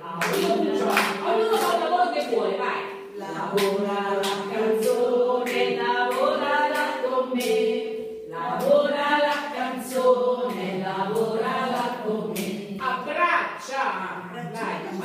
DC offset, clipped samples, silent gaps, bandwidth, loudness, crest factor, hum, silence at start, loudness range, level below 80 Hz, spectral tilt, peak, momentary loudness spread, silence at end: under 0.1%; under 0.1%; none; 15.5 kHz; -24 LUFS; 18 dB; none; 0 s; 3 LU; -70 dBFS; -4 dB/octave; -6 dBFS; 9 LU; 0 s